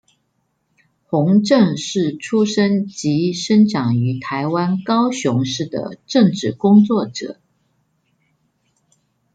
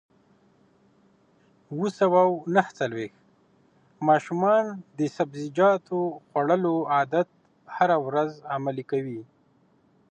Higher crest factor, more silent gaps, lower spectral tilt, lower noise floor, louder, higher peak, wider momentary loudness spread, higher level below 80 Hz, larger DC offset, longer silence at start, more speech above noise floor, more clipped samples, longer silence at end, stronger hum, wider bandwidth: second, 16 dB vs 22 dB; neither; about the same, -6 dB/octave vs -7 dB/octave; first, -68 dBFS vs -63 dBFS; first, -17 LUFS vs -25 LUFS; about the same, -2 dBFS vs -4 dBFS; about the same, 9 LU vs 11 LU; first, -62 dBFS vs -76 dBFS; neither; second, 1.1 s vs 1.7 s; first, 52 dB vs 39 dB; neither; first, 2 s vs 0.85 s; neither; about the same, 9 kHz vs 8.8 kHz